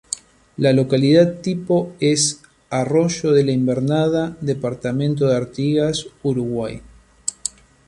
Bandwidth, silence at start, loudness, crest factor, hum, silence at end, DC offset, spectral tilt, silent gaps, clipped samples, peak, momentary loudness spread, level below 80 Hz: 11.5 kHz; 0.1 s; -19 LUFS; 18 dB; none; 0.4 s; under 0.1%; -5.5 dB/octave; none; under 0.1%; -2 dBFS; 13 LU; -52 dBFS